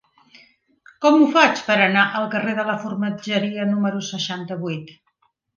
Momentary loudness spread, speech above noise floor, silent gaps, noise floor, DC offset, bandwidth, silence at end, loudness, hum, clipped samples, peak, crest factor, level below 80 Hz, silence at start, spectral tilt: 13 LU; 47 dB; none; -67 dBFS; under 0.1%; 7.2 kHz; 0.65 s; -19 LUFS; none; under 0.1%; -2 dBFS; 20 dB; -70 dBFS; 1 s; -5 dB/octave